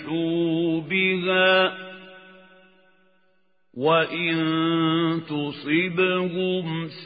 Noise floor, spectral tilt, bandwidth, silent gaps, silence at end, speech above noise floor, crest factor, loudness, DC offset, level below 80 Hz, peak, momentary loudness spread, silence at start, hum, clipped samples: -69 dBFS; -10.5 dB/octave; 5 kHz; none; 0 s; 46 dB; 18 dB; -22 LUFS; under 0.1%; -72 dBFS; -6 dBFS; 10 LU; 0 s; none; under 0.1%